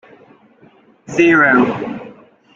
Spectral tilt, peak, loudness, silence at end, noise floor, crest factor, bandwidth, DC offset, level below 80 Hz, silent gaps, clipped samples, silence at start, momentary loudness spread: -6 dB/octave; -2 dBFS; -13 LUFS; 0.45 s; -49 dBFS; 16 dB; 7.6 kHz; under 0.1%; -58 dBFS; none; under 0.1%; 1.1 s; 17 LU